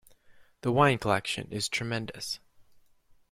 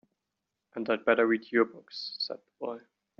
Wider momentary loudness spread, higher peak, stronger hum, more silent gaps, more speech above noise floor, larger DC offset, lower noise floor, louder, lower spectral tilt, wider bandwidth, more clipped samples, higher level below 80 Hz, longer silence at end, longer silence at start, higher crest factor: about the same, 12 LU vs 14 LU; about the same, -10 dBFS vs -10 dBFS; neither; neither; second, 33 dB vs 56 dB; neither; second, -61 dBFS vs -86 dBFS; about the same, -29 LUFS vs -30 LUFS; first, -4.5 dB/octave vs -1.5 dB/octave; first, 16 kHz vs 6.6 kHz; neither; first, -60 dBFS vs -80 dBFS; first, 0.7 s vs 0.4 s; second, 0.3 s vs 0.75 s; about the same, 22 dB vs 22 dB